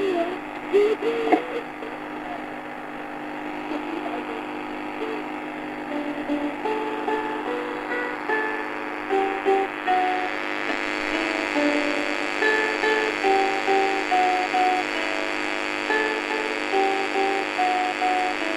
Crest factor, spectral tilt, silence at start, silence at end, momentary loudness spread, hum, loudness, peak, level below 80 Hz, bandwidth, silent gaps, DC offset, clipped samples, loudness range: 20 dB; -3 dB/octave; 0 s; 0 s; 11 LU; none; -24 LUFS; -4 dBFS; -58 dBFS; 14 kHz; none; under 0.1%; under 0.1%; 9 LU